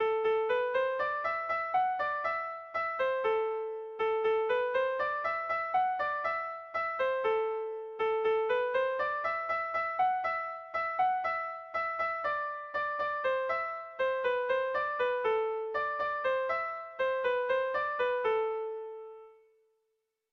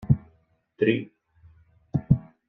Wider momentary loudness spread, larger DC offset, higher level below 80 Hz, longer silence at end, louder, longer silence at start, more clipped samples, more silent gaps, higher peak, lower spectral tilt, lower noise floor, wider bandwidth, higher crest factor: about the same, 6 LU vs 8 LU; neither; second, -70 dBFS vs -46 dBFS; first, 1 s vs 0.3 s; second, -32 LUFS vs -26 LUFS; about the same, 0 s vs 0 s; neither; neither; second, -18 dBFS vs -6 dBFS; second, -4 dB/octave vs -10.5 dB/octave; first, -81 dBFS vs -65 dBFS; first, 6.4 kHz vs 3.9 kHz; second, 12 dB vs 22 dB